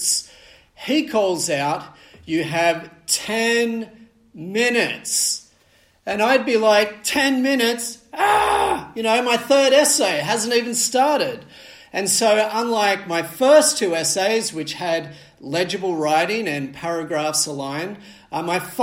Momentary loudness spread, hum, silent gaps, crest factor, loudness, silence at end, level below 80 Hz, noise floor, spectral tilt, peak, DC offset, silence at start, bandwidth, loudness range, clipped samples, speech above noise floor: 12 LU; none; none; 18 dB; -19 LUFS; 0 s; -58 dBFS; -57 dBFS; -2.5 dB/octave; -2 dBFS; under 0.1%; 0 s; 16 kHz; 5 LU; under 0.1%; 38 dB